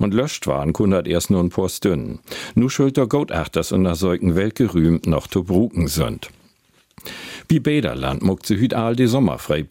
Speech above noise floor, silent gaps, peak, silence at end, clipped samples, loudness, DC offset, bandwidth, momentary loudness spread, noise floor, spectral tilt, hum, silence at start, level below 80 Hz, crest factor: 40 dB; none; -4 dBFS; 0.05 s; under 0.1%; -19 LUFS; under 0.1%; 17 kHz; 8 LU; -59 dBFS; -6.5 dB/octave; none; 0 s; -40 dBFS; 14 dB